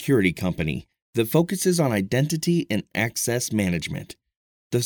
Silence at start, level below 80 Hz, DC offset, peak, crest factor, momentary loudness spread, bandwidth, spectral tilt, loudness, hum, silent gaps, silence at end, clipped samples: 0 s; -50 dBFS; under 0.1%; -4 dBFS; 20 dB; 9 LU; 19.5 kHz; -5 dB/octave; -24 LUFS; none; 1.02-1.13 s, 4.37-4.70 s; 0 s; under 0.1%